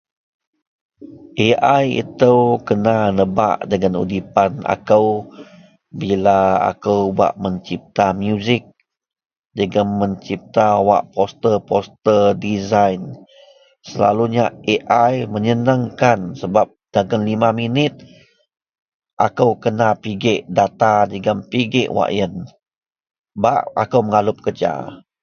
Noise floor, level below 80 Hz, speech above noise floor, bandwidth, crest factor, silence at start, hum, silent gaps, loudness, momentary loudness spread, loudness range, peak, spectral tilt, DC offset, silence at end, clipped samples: -49 dBFS; -50 dBFS; 32 dB; 6.8 kHz; 18 dB; 1 s; none; 18.82-19.00 s, 19.13-19.17 s, 22.77-22.81 s, 23.19-23.24 s; -17 LUFS; 8 LU; 3 LU; 0 dBFS; -6.5 dB/octave; under 0.1%; 0.25 s; under 0.1%